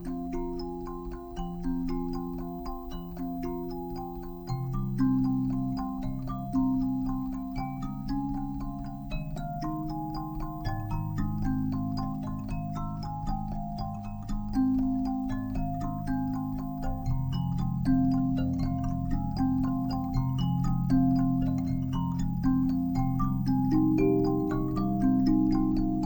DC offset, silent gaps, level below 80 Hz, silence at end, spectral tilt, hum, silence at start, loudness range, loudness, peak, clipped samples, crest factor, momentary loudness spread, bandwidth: under 0.1%; none; -38 dBFS; 0 s; -9 dB/octave; none; 0 s; 8 LU; -30 LUFS; -14 dBFS; under 0.1%; 16 dB; 11 LU; over 20 kHz